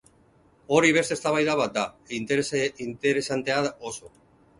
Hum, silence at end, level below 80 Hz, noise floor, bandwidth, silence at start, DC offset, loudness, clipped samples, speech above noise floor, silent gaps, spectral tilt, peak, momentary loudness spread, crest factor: none; 0.5 s; -62 dBFS; -60 dBFS; 11.5 kHz; 0.7 s; under 0.1%; -25 LUFS; under 0.1%; 34 dB; none; -4 dB/octave; -6 dBFS; 12 LU; 20 dB